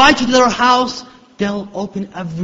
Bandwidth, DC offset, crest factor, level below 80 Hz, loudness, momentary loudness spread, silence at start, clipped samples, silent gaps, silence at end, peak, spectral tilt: 8 kHz; under 0.1%; 16 dB; -44 dBFS; -15 LUFS; 14 LU; 0 s; under 0.1%; none; 0 s; 0 dBFS; -3.5 dB/octave